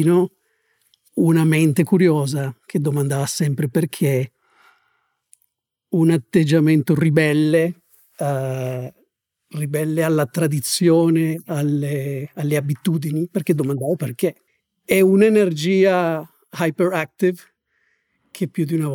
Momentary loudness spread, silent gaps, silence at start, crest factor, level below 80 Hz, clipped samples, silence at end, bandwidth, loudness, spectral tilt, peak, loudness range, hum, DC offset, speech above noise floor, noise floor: 11 LU; none; 0 s; 16 dB; -64 dBFS; under 0.1%; 0 s; 18.5 kHz; -19 LUFS; -6.5 dB/octave; -4 dBFS; 4 LU; none; under 0.1%; 52 dB; -70 dBFS